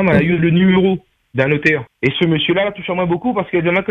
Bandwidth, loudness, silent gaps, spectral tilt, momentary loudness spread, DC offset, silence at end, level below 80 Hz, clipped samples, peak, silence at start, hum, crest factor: 6.8 kHz; -16 LUFS; none; -8 dB/octave; 7 LU; under 0.1%; 0 s; -46 dBFS; under 0.1%; 0 dBFS; 0 s; none; 14 dB